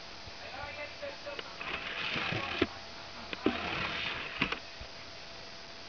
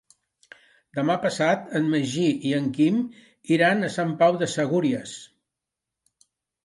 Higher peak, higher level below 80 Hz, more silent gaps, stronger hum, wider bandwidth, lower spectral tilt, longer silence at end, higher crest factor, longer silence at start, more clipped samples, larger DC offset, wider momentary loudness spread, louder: second, -12 dBFS vs -8 dBFS; first, -58 dBFS vs -72 dBFS; neither; neither; second, 5.4 kHz vs 11.5 kHz; second, -4 dB/octave vs -5.5 dB/octave; second, 0 s vs 1.4 s; first, 26 dB vs 18 dB; second, 0 s vs 0.95 s; neither; first, 0.2% vs under 0.1%; about the same, 12 LU vs 12 LU; second, -37 LUFS vs -23 LUFS